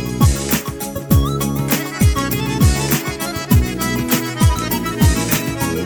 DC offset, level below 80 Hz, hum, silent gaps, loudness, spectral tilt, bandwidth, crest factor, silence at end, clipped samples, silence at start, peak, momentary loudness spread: under 0.1%; -24 dBFS; none; none; -17 LUFS; -5 dB/octave; 19.5 kHz; 14 dB; 0 s; under 0.1%; 0 s; -2 dBFS; 5 LU